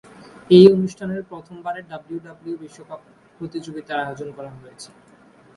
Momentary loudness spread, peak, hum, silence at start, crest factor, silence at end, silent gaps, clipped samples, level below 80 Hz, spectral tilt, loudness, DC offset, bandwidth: 28 LU; 0 dBFS; none; 0.5 s; 20 dB; 0.7 s; none; under 0.1%; -62 dBFS; -7.5 dB/octave; -17 LUFS; under 0.1%; 11 kHz